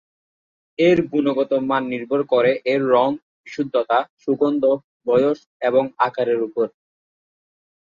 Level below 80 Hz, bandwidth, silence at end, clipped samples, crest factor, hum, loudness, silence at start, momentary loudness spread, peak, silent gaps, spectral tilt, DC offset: -64 dBFS; 7.2 kHz; 1.15 s; under 0.1%; 16 dB; none; -20 LUFS; 0.8 s; 8 LU; -4 dBFS; 3.22-3.44 s, 4.10-4.17 s, 4.84-5.00 s, 5.46-5.60 s; -7 dB/octave; under 0.1%